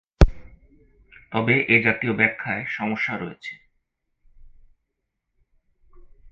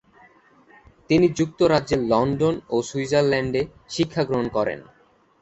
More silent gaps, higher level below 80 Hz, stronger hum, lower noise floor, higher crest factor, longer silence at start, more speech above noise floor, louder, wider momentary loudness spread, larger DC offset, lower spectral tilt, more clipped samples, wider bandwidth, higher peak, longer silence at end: neither; first, -30 dBFS vs -50 dBFS; neither; first, -79 dBFS vs -54 dBFS; first, 24 dB vs 18 dB; second, 0.2 s vs 1.1 s; first, 56 dB vs 33 dB; about the same, -22 LUFS vs -22 LUFS; first, 15 LU vs 7 LU; neither; about the same, -7 dB/octave vs -6 dB/octave; neither; second, 7.4 kHz vs 8.2 kHz; first, 0 dBFS vs -4 dBFS; second, 0 s vs 0.6 s